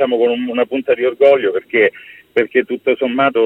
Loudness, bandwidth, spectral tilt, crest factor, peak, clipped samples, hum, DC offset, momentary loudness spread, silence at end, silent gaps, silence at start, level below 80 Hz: -15 LUFS; 4.4 kHz; -6.5 dB/octave; 14 dB; 0 dBFS; under 0.1%; none; under 0.1%; 6 LU; 0 s; none; 0 s; -64 dBFS